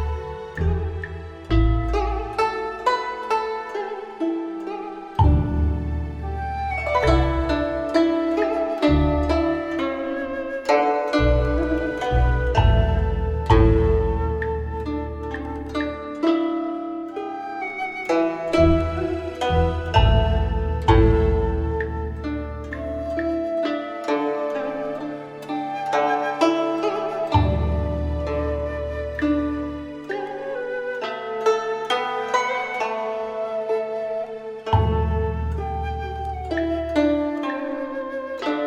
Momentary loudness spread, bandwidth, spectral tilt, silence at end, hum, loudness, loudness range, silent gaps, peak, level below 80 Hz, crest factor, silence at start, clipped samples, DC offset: 11 LU; 8.4 kHz; -7.5 dB/octave; 0 s; none; -23 LUFS; 5 LU; none; -4 dBFS; -28 dBFS; 18 dB; 0 s; under 0.1%; under 0.1%